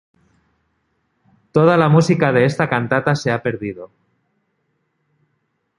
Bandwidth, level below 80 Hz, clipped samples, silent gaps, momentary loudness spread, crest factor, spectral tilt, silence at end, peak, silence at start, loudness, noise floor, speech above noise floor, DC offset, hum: 11 kHz; -56 dBFS; under 0.1%; none; 13 LU; 18 dB; -7 dB/octave; 1.9 s; -2 dBFS; 1.55 s; -16 LUFS; -69 dBFS; 54 dB; under 0.1%; none